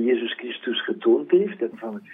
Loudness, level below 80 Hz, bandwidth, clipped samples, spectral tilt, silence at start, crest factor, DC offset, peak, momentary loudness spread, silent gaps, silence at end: -23 LUFS; -84 dBFS; 3.9 kHz; under 0.1%; -8 dB/octave; 0 s; 16 dB; under 0.1%; -8 dBFS; 11 LU; none; 0 s